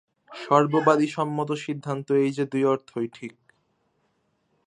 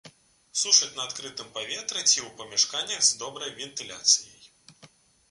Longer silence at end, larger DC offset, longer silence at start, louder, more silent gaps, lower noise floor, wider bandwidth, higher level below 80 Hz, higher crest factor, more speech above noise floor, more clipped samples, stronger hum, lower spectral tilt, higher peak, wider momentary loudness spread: first, 1.35 s vs 0.45 s; neither; first, 0.3 s vs 0.05 s; about the same, -24 LUFS vs -24 LUFS; neither; first, -71 dBFS vs -57 dBFS; about the same, 10.5 kHz vs 11.5 kHz; about the same, -76 dBFS vs -72 dBFS; about the same, 22 dB vs 24 dB; first, 47 dB vs 29 dB; neither; neither; first, -7 dB/octave vs 1.5 dB/octave; about the same, -4 dBFS vs -4 dBFS; first, 18 LU vs 15 LU